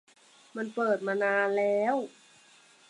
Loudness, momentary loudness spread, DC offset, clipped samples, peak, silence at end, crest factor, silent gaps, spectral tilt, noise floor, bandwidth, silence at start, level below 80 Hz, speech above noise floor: -29 LUFS; 13 LU; under 0.1%; under 0.1%; -14 dBFS; 0.8 s; 16 dB; none; -5.5 dB/octave; -59 dBFS; 11 kHz; 0.55 s; -88 dBFS; 31 dB